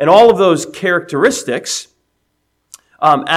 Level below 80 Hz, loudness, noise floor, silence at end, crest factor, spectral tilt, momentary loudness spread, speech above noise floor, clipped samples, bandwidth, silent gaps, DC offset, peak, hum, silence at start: -56 dBFS; -13 LUFS; -66 dBFS; 0 s; 14 dB; -4 dB/octave; 11 LU; 54 dB; 0.3%; 15 kHz; none; under 0.1%; 0 dBFS; none; 0 s